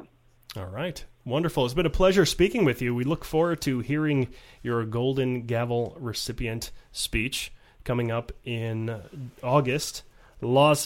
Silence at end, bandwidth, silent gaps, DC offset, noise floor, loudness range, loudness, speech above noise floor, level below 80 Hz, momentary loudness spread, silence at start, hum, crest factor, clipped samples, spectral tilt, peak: 0 s; 16.5 kHz; none; under 0.1%; -52 dBFS; 6 LU; -27 LUFS; 26 dB; -42 dBFS; 15 LU; 0 s; none; 20 dB; under 0.1%; -5.5 dB/octave; -8 dBFS